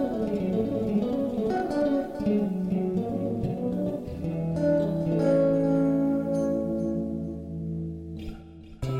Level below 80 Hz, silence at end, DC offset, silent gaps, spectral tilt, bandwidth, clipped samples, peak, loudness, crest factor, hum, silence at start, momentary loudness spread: -48 dBFS; 0 s; under 0.1%; none; -9 dB/octave; 10.5 kHz; under 0.1%; -12 dBFS; -27 LUFS; 14 dB; none; 0 s; 11 LU